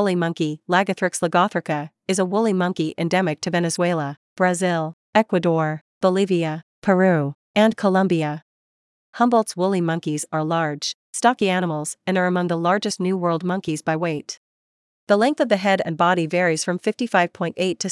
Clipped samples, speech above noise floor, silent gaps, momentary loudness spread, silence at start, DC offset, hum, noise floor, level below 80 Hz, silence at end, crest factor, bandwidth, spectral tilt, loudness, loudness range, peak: under 0.1%; over 70 dB; 4.17-4.36 s, 4.93-5.13 s, 5.81-6.01 s, 6.63-6.82 s, 7.35-7.54 s, 8.42-9.13 s, 10.94-11.13 s, 14.37-15.07 s; 7 LU; 0 s; under 0.1%; none; under -90 dBFS; -72 dBFS; 0 s; 18 dB; 12 kHz; -5 dB/octave; -21 LUFS; 2 LU; -4 dBFS